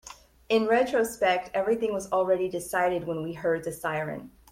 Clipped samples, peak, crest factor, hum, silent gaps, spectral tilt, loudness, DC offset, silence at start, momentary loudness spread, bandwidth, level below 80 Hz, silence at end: under 0.1%; -12 dBFS; 16 dB; none; none; -4.5 dB/octave; -27 LUFS; under 0.1%; 0.05 s; 9 LU; 16.5 kHz; -60 dBFS; 0.25 s